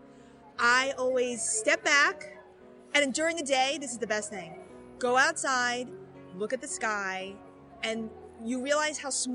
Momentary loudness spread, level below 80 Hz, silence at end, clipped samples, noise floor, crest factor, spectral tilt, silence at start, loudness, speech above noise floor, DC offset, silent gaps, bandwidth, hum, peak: 19 LU; -68 dBFS; 0 s; under 0.1%; -53 dBFS; 20 dB; -1 dB/octave; 0.05 s; -28 LUFS; 24 dB; under 0.1%; none; 11.5 kHz; none; -10 dBFS